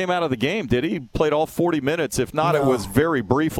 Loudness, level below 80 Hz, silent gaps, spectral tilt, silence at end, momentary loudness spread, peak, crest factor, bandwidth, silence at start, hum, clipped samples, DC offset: -21 LUFS; -42 dBFS; none; -5.5 dB/octave; 0 s; 3 LU; -2 dBFS; 20 dB; 17.5 kHz; 0 s; none; under 0.1%; under 0.1%